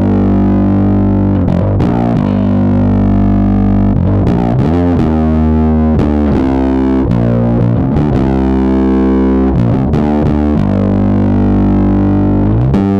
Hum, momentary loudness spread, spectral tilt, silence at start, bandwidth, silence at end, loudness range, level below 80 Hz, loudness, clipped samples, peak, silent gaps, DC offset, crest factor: none; 1 LU; -10.5 dB/octave; 0 s; 6.2 kHz; 0 s; 0 LU; -20 dBFS; -11 LUFS; under 0.1%; 0 dBFS; none; under 0.1%; 8 dB